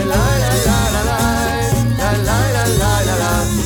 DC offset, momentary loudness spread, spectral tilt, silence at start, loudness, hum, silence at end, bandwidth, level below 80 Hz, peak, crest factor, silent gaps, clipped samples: under 0.1%; 2 LU; -4.5 dB/octave; 0 s; -15 LUFS; none; 0 s; over 20 kHz; -24 dBFS; -2 dBFS; 12 dB; none; under 0.1%